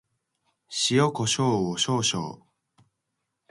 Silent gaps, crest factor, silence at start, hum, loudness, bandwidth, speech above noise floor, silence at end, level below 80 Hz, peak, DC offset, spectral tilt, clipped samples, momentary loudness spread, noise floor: none; 18 dB; 0.7 s; none; -24 LUFS; 11.5 kHz; 56 dB; 1.15 s; -64 dBFS; -10 dBFS; under 0.1%; -4 dB/octave; under 0.1%; 11 LU; -81 dBFS